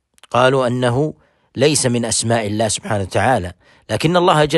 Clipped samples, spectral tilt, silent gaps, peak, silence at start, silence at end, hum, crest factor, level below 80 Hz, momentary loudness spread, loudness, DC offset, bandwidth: under 0.1%; -4.5 dB/octave; none; 0 dBFS; 0.3 s; 0 s; none; 16 dB; -48 dBFS; 7 LU; -17 LUFS; under 0.1%; 12.5 kHz